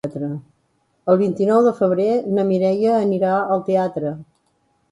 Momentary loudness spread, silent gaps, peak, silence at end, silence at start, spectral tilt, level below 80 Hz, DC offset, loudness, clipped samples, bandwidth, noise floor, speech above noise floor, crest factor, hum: 12 LU; none; -2 dBFS; 0.7 s; 0.05 s; -8.5 dB/octave; -64 dBFS; under 0.1%; -19 LUFS; under 0.1%; 11 kHz; -65 dBFS; 47 dB; 16 dB; none